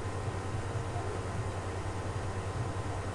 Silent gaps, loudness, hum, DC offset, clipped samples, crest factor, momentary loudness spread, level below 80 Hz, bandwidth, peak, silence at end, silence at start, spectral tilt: none; -37 LUFS; none; under 0.1%; under 0.1%; 12 dB; 1 LU; -48 dBFS; 11.5 kHz; -24 dBFS; 0 s; 0 s; -6 dB/octave